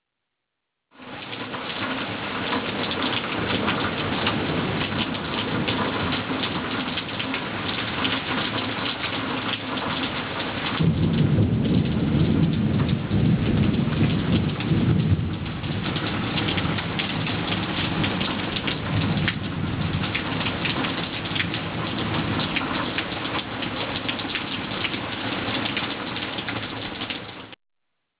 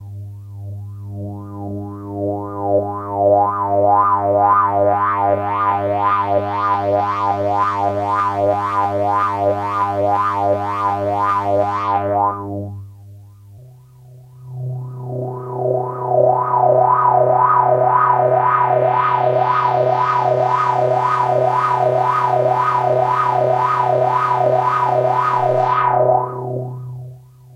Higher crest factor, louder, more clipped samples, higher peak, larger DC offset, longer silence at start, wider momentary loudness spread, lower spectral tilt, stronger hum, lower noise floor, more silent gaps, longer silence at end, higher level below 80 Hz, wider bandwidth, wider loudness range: about the same, 16 dB vs 14 dB; second, -24 LUFS vs -16 LUFS; neither; second, -8 dBFS vs -2 dBFS; neither; first, 1 s vs 0 s; second, 6 LU vs 15 LU; first, -10 dB/octave vs -8 dB/octave; neither; first, -81 dBFS vs -42 dBFS; neither; first, 0.65 s vs 0.35 s; first, -40 dBFS vs -58 dBFS; second, 4 kHz vs 9.6 kHz; second, 4 LU vs 8 LU